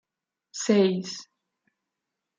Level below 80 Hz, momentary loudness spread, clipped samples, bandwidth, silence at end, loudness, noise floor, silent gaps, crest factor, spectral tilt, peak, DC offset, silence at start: -76 dBFS; 18 LU; under 0.1%; 9.4 kHz; 1.15 s; -24 LUFS; -87 dBFS; none; 20 dB; -5 dB/octave; -8 dBFS; under 0.1%; 0.55 s